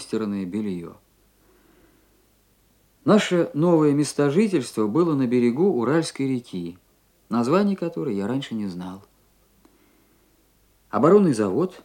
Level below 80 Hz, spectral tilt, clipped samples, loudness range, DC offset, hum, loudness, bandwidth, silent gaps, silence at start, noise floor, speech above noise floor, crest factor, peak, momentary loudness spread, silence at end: -66 dBFS; -6.5 dB/octave; under 0.1%; 7 LU; under 0.1%; none; -22 LUFS; 16 kHz; none; 0 s; -61 dBFS; 40 dB; 20 dB; -4 dBFS; 14 LU; 0.05 s